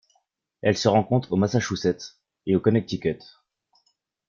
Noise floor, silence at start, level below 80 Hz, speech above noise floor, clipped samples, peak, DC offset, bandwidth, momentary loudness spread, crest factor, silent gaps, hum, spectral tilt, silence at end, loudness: -71 dBFS; 0.65 s; -58 dBFS; 48 dB; under 0.1%; -4 dBFS; under 0.1%; 7.4 kHz; 14 LU; 20 dB; none; none; -6 dB/octave; 1.15 s; -24 LUFS